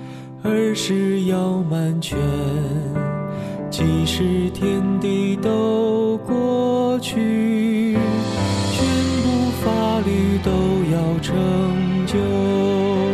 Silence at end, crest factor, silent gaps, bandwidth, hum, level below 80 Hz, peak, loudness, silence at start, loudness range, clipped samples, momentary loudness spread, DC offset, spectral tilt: 0 s; 12 dB; none; 14 kHz; none; -42 dBFS; -6 dBFS; -20 LUFS; 0 s; 2 LU; under 0.1%; 4 LU; under 0.1%; -6.5 dB/octave